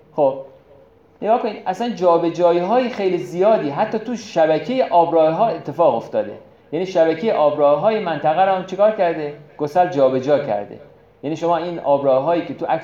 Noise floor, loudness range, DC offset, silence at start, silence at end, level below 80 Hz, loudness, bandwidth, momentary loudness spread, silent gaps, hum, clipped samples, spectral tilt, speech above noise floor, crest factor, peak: -49 dBFS; 2 LU; under 0.1%; 0.15 s; 0 s; -64 dBFS; -18 LUFS; 7.6 kHz; 10 LU; none; none; under 0.1%; -6.5 dB/octave; 32 dB; 14 dB; -4 dBFS